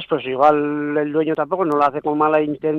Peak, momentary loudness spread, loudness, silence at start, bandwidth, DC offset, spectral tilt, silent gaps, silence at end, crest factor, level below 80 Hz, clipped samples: -2 dBFS; 5 LU; -18 LUFS; 0 s; 6.6 kHz; under 0.1%; -8 dB/octave; none; 0 s; 16 dB; -62 dBFS; under 0.1%